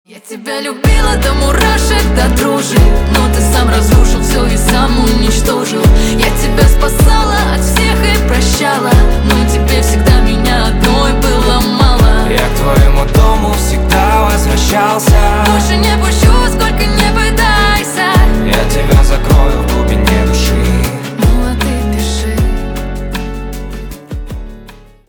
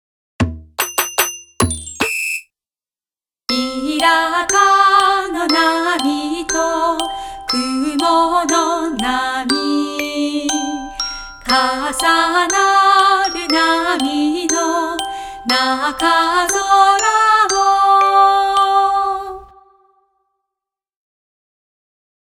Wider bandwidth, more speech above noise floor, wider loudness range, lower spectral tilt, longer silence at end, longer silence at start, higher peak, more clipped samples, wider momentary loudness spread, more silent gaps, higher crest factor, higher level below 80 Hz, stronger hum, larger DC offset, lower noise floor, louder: first, over 20 kHz vs 18 kHz; second, 26 dB vs over 76 dB; second, 3 LU vs 7 LU; first, -5 dB/octave vs -2.5 dB/octave; second, 0.3 s vs 2.8 s; second, 0.15 s vs 0.4 s; about the same, 0 dBFS vs 0 dBFS; neither; second, 7 LU vs 11 LU; neither; second, 10 dB vs 16 dB; first, -12 dBFS vs -44 dBFS; neither; neither; second, -35 dBFS vs under -90 dBFS; first, -11 LUFS vs -15 LUFS